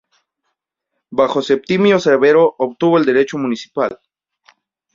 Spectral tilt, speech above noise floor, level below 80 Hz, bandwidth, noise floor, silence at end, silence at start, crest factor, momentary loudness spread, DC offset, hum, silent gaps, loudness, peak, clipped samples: -6 dB/octave; 61 dB; -60 dBFS; 7.6 kHz; -76 dBFS; 1 s; 1.1 s; 16 dB; 10 LU; under 0.1%; none; none; -15 LUFS; -2 dBFS; under 0.1%